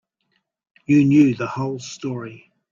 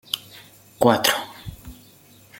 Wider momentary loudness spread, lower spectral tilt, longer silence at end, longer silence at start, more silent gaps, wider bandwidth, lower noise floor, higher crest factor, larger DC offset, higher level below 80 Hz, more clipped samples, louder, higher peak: second, 19 LU vs 26 LU; first, -7 dB/octave vs -3.5 dB/octave; second, 0.35 s vs 0.65 s; first, 0.9 s vs 0.15 s; neither; second, 7.4 kHz vs 17 kHz; first, -71 dBFS vs -51 dBFS; second, 16 dB vs 24 dB; neither; second, -60 dBFS vs -52 dBFS; neither; about the same, -19 LUFS vs -21 LUFS; about the same, -4 dBFS vs -2 dBFS